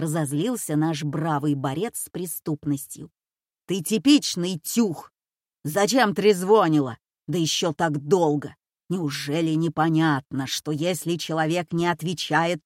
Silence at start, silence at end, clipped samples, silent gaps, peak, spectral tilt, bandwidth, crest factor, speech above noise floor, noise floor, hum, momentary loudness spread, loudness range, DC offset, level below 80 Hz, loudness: 0 s; 0.05 s; under 0.1%; none; -6 dBFS; -5 dB/octave; 16.5 kHz; 18 dB; over 67 dB; under -90 dBFS; none; 11 LU; 5 LU; under 0.1%; -66 dBFS; -24 LUFS